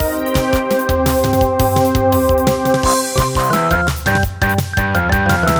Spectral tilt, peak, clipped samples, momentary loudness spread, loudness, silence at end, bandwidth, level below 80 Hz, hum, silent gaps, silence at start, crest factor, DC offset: -5 dB/octave; -2 dBFS; under 0.1%; 3 LU; -15 LUFS; 0 s; over 20 kHz; -26 dBFS; none; none; 0 s; 14 dB; under 0.1%